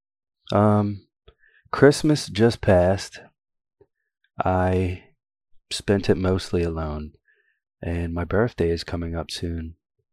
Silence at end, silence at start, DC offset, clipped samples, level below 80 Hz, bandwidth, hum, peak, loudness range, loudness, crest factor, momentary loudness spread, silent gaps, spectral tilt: 0.4 s; 0.5 s; under 0.1%; under 0.1%; -46 dBFS; 14 kHz; none; -2 dBFS; 6 LU; -23 LUFS; 22 dB; 16 LU; none; -6.5 dB/octave